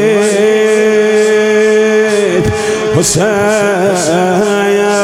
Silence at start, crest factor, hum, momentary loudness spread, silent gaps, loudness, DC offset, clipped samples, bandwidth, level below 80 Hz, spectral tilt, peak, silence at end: 0 s; 10 dB; none; 3 LU; none; -10 LUFS; under 0.1%; under 0.1%; 15 kHz; -42 dBFS; -4.5 dB/octave; 0 dBFS; 0 s